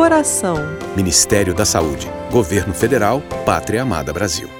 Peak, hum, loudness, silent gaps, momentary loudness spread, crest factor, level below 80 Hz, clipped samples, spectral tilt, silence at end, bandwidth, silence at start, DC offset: 0 dBFS; none; -16 LUFS; none; 8 LU; 16 dB; -38 dBFS; under 0.1%; -4 dB/octave; 0 s; 18.5 kHz; 0 s; under 0.1%